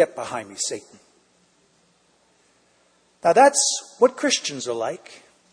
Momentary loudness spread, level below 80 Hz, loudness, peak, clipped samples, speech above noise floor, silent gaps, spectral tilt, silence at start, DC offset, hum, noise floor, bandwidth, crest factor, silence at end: 16 LU; -74 dBFS; -21 LUFS; -2 dBFS; under 0.1%; 41 dB; none; -1.5 dB/octave; 0 s; under 0.1%; none; -62 dBFS; 10.5 kHz; 20 dB; 0.4 s